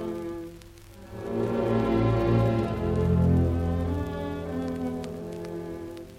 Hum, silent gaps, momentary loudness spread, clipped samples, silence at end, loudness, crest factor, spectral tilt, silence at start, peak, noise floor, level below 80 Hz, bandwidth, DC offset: none; none; 15 LU; under 0.1%; 0 s; -27 LUFS; 16 dB; -8.5 dB/octave; 0 s; -12 dBFS; -47 dBFS; -40 dBFS; 14.5 kHz; under 0.1%